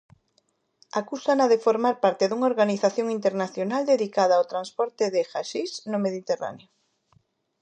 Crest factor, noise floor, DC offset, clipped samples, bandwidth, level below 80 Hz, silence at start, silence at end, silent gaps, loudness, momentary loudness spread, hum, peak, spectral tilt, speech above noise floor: 18 dB; -70 dBFS; under 0.1%; under 0.1%; 9.6 kHz; -78 dBFS; 0.95 s; 1.05 s; none; -24 LUFS; 9 LU; none; -8 dBFS; -5 dB/octave; 46 dB